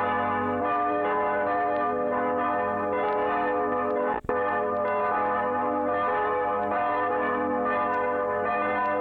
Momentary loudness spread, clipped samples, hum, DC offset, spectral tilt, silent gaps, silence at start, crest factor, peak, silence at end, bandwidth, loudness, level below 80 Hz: 1 LU; under 0.1%; none; under 0.1%; -8 dB/octave; none; 0 s; 14 dB; -12 dBFS; 0 s; 4.6 kHz; -26 LUFS; -60 dBFS